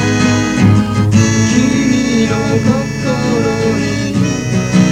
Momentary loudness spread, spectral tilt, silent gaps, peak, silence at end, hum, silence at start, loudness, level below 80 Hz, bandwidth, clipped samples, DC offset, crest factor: 5 LU; -5.5 dB/octave; none; 0 dBFS; 0 s; none; 0 s; -13 LUFS; -34 dBFS; 12 kHz; under 0.1%; under 0.1%; 12 dB